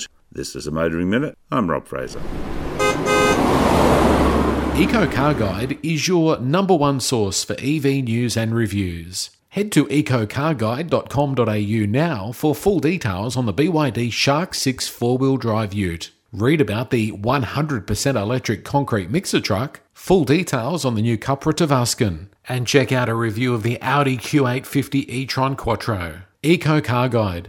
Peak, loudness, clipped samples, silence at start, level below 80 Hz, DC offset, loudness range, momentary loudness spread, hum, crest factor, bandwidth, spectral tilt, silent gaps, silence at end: 0 dBFS; -20 LUFS; under 0.1%; 0 s; -38 dBFS; under 0.1%; 3 LU; 8 LU; none; 18 dB; 18.5 kHz; -5.5 dB/octave; none; 0 s